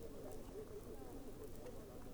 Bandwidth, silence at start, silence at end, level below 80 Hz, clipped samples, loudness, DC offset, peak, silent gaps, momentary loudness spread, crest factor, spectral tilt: over 20 kHz; 0 s; 0 s; -58 dBFS; under 0.1%; -54 LUFS; under 0.1%; -36 dBFS; none; 2 LU; 14 dB; -6 dB/octave